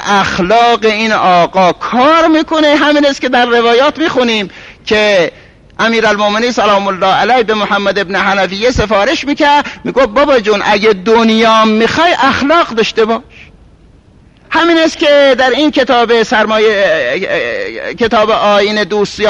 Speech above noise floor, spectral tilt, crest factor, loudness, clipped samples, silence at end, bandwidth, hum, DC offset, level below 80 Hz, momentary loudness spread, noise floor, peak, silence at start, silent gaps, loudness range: 33 dB; -4 dB/octave; 10 dB; -10 LUFS; under 0.1%; 0 s; 11 kHz; none; under 0.1%; -38 dBFS; 6 LU; -42 dBFS; 0 dBFS; 0 s; none; 2 LU